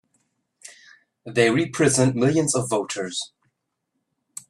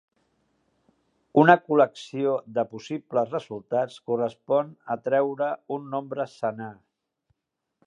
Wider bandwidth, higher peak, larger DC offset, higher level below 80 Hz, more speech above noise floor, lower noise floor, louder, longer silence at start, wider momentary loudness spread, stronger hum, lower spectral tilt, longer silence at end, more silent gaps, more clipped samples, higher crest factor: first, 14.5 kHz vs 10 kHz; second, -4 dBFS vs 0 dBFS; neither; first, -60 dBFS vs -76 dBFS; about the same, 56 dB vs 58 dB; second, -77 dBFS vs -83 dBFS; first, -21 LUFS vs -25 LUFS; second, 0.65 s vs 1.35 s; about the same, 12 LU vs 14 LU; neither; second, -4.5 dB/octave vs -7 dB/octave; about the same, 1.25 s vs 1.15 s; neither; neither; second, 20 dB vs 26 dB